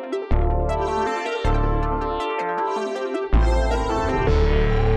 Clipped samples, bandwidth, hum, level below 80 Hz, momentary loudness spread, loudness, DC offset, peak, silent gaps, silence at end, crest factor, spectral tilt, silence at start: under 0.1%; 9.4 kHz; none; -24 dBFS; 5 LU; -23 LUFS; under 0.1%; -6 dBFS; none; 0 s; 14 dB; -7 dB/octave; 0 s